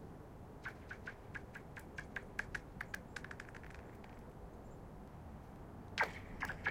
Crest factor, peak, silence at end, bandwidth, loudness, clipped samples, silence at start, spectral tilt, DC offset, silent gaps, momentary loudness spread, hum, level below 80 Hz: 28 dB; -20 dBFS; 0 s; 16.5 kHz; -48 LUFS; under 0.1%; 0 s; -4.5 dB/octave; under 0.1%; none; 14 LU; none; -58 dBFS